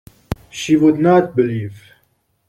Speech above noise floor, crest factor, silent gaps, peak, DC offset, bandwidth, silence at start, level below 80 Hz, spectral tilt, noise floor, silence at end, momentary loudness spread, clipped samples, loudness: 48 dB; 16 dB; none; -2 dBFS; under 0.1%; 13.5 kHz; 0.3 s; -46 dBFS; -6.5 dB/octave; -63 dBFS; 0.7 s; 17 LU; under 0.1%; -15 LUFS